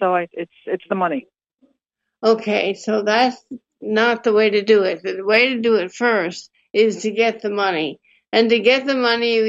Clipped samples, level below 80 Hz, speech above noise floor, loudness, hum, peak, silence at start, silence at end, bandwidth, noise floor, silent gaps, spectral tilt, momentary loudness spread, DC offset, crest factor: under 0.1%; -72 dBFS; 60 dB; -18 LUFS; none; -2 dBFS; 0 s; 0 s; 7.8 kHz; -78 dBFS; 1.54-1.58 s; -4.5 dB/octave; 12 LU; under 0.1%; 16 dB